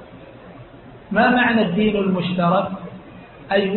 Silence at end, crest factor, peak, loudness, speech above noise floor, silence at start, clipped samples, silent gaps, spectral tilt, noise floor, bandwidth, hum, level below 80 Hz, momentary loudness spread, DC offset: 0 s; 14 dB; -6 dBFS; -19 LUFS; 24 dB; 0 s; under 0.1%; none; -11 dB/octave; -41 dBFS; 4.3 kHz; none; -50 dBFS; 16 LU; under 0.1%